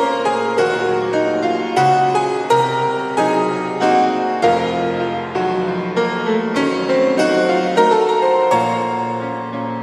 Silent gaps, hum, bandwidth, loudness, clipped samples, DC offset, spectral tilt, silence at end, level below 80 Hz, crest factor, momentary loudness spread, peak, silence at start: none; none; 12.5 kHz; -17 LUFS; under 0.1%; under 0.1%; -5.5 dB/octave; 0 s; -64 dBFS; 16 dB; 6 LU; -2 dBFS; 0 s